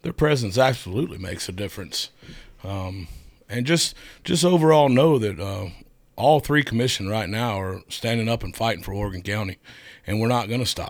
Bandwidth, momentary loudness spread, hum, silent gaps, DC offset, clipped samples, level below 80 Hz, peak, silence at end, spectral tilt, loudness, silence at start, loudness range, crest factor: over 20 kHz; 16 LU; none; none; under 0.1%; under 0.1%; -46 dBFS; -4 dBFS; 0 s; -5 dB/octave; -23 LUFS; 0.05 s; 7 LU; 18 dB